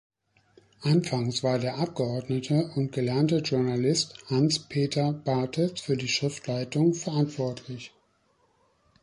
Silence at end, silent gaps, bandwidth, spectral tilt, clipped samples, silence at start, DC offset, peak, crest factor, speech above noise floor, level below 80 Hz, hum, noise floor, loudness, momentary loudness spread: 1.15 s; none; 11.5 kHz; -5.5 dB/octave; under 0.1%; 0.8 s; under 0.1%; -12 dBFS; 16 dB; 41 dB; -64 dBFS; none; -68 dBFS; -27 LUFS; 7 LU